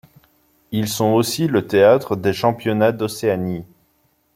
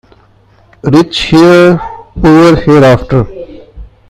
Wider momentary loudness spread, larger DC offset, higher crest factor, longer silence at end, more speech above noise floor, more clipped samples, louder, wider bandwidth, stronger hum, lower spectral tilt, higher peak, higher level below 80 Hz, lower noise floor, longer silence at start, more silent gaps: second, 10 LU vs 15 LU; neither; first, 16 dB vs 8 dB; first, 0.7 s vs 0.25 s; first, 45 dB vs 38 dB; second, under 0.1% vs 2%; second, -18 LUFS vs -6 LUFS; first, 16.5 kHz vs 12.5 kHz; neither; second, -5.5 dB/octave vs -7 dB/octave; about the same, -2 dBFS vs 0 dBFS; second, -56 dBFS vs -28 dBFS; first, -63 dBFS vs -44 dBFS; second, 0.7 s vs 0.85 s; neither